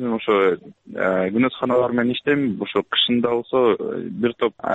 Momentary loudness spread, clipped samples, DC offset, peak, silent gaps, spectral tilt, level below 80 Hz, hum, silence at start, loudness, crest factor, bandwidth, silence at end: 6 LU; under 0.1%; under 0.1%; -6 dBFS; none; -7.5 dB/octave; -60 dBFS; none; 0 s; -20 LUFS; 14 dB; 7.8 kHz; 0 s